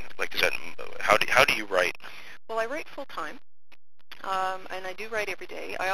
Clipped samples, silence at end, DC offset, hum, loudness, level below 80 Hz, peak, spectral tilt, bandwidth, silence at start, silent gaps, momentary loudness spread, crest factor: under 0.1%; 0 s; under 0.1%; none; -27 LUFS; -58 dBFS; 0 dBFS; -2 dB/octave; 15 kHz; 0 s; none; 18 LU; 26 dB